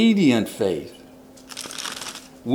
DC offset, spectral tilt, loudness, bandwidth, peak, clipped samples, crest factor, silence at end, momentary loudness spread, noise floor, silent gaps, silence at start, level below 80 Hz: under 0.1%; -5 dB/octave; -24 LUFS; 18 kHz; -6 dBFS; under 0.1%; 18 dB; 0 s; 17 LU; -46 dBFS; none; 0 s; -60 dBFS